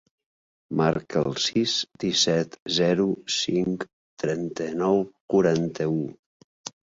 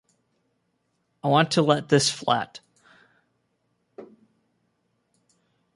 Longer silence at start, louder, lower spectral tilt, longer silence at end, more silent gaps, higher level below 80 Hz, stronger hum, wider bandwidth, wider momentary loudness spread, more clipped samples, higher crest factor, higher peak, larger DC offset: second, 0.7 s vs 1.25 s; second, -25 LUFS vs -22 LUFS; about the same, -4.5 dB/octave vs -4.5 dB/octave; second, 0.15 s vs 1.7 s; first, 2.62-2.66 s, 3.93-4.17 s, 5.21-5.28 s, 6.19-6.64 s vs none; first, -60 dBFS vs -70 dBFS; neither; second, 7.8 kHz vs 11.5 kHz; about the same, 10 LU vs 9 LU; neither; second, 18 dB vs 24 dB; second, -8 dBFS vs -4 dBFS; neither